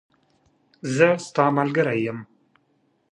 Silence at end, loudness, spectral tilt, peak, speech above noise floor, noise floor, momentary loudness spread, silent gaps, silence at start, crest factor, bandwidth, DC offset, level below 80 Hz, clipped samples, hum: 0.9 s; -21 LUFS; -6 dB/octave; -2 dBFS; 46 dB; -67 dBFS; 13 LU; none; 0.85 s; 22 dB; 11 kHz; under 0.1%; -70 dBFS; under 0.1%; none